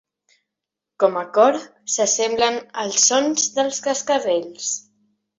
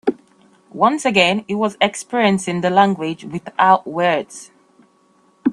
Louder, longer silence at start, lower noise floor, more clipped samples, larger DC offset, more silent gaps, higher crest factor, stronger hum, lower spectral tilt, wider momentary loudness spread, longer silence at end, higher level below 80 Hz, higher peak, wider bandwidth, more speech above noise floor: about the same, -19 LUFS vs -17 LUFS; first, 1 s vs 0.05 s; first, -84 dBFS vs -56 dBFS; neither; neither; neither; about the same, 18 dB vs 18 dB; neither; second, -1 dB/octave vs -4.5 dB/octave; about the same, 10 LU vs 12 LU; first, 0.6 s vs 0 s; about the same, -66 dBFS vs -62 dBFS; second, -4 dBFS vs 0 dBFS; second, 8 kHz vs 12 kHz; first, 65 dB vs 39 dB